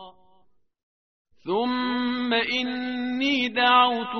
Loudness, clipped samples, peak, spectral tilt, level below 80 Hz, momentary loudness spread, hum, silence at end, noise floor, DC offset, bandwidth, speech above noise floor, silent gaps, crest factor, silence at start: -23 LUFS; under 0.1%; -6 dBFS; 0 dB/octave; -66 dBFS; 10 LU; none; 0 s; -63 dBFS; 0.1%; 6.4 kHz; 40 dB; 0.83-1.25 s; 20 dB; 0 s